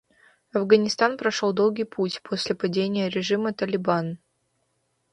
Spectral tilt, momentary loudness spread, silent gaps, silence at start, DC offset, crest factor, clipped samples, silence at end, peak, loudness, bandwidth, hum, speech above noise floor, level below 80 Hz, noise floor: -5 dB/octave; 9 LU; none; 0.55 s; under 0.1%; 20 dB; under 0.1%; 0.95 s; -4 dBFS; -24 LUFS; 10.5 kHz; none; 49 dB; -68 dBFS; -72 dBFS